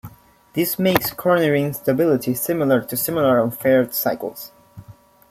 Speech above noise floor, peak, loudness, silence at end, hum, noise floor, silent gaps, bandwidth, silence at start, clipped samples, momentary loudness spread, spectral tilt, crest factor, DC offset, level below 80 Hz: 27 dB; 0 dBFS; -19 LUFS; 0.4 s; none; -46 dBFS; none; 16.5 kHz; 0.05 s; under 0.1%; 10 LU; -5.5 dB/octave; 20 dB; under 0.1%; -56 dBFS